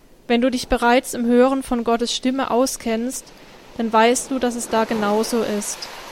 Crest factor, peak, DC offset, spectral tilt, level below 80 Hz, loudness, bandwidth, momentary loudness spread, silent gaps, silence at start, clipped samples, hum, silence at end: 16 dB; -4 dBFS; under 0.1%; -3.5 dB/octave; -44 dBFS; -20 LUFS; 16.5 kHz; 10 LU; none; 0.3 s; under 0.1%; none; 0 s